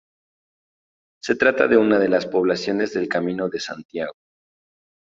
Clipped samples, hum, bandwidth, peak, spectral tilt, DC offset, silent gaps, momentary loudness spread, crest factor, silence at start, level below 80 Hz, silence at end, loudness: under 0.1%; none; 7.8 kHz; -2 dBFS; -5.5 dB/octave; under 0.1%; 3.85-3.89 s; 14 LU; 20 dB; 1.25 s; -62 dBFS; 0.9 s; -20 LUFS